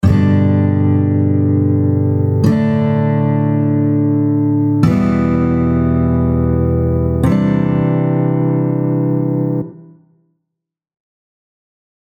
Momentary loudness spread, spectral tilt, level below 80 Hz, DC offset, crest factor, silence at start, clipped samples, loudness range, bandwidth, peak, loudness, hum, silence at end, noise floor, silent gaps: 3 LU; -10 dB/octave; -32 dBFS; under 0.1%; 14 dB; 0.05 s; under 0.1%; 5 LU; 7.6 kHz; 0 dBFS; -14 LUFS; none; 2.15 s; -76 dBFS; none